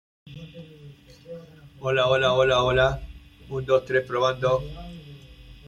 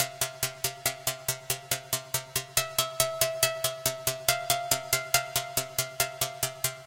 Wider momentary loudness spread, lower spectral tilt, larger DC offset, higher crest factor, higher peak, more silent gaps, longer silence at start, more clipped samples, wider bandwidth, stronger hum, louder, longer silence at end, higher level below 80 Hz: first, 23 LU vs 5 LU; first, -5.5 dB/octave vs -1 dB/octave; neither; second, 18 dB vs 26 dB; about the same, -8 dBFS vs -6 dBFS; neither; first, 0.25 s vs 0 s; neither; second, 10 kHz vs 17.5 kHz; neither; first, -23 LUFS vs -28 LUFS; about the same, 0.1 s vs 0 s; first, -44 dBFS vs -58 dBFS